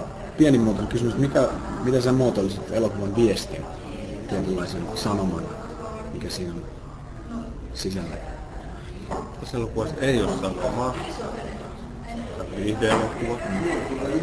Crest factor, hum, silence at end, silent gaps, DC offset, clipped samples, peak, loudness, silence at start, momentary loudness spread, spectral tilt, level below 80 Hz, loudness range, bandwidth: 20 dB; none; 0 s; none; under 0.1%; under 0.1%; -6 dBFS; -26 LUFS; 0 s; 15 LU; -6 dB/octave; -40 dBFS; 11 LU; 11 kHz